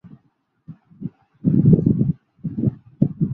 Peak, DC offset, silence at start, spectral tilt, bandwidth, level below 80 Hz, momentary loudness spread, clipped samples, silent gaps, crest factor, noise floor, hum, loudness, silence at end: -2 dBFS; under 0.1%; 0.05 s; -14.5 dB/octave; 1.8 kHz; -46 dBFS; 20 LU; under 0.1%; none; 20 dB; -65 dBFS; none; -20 LUFS; 0 s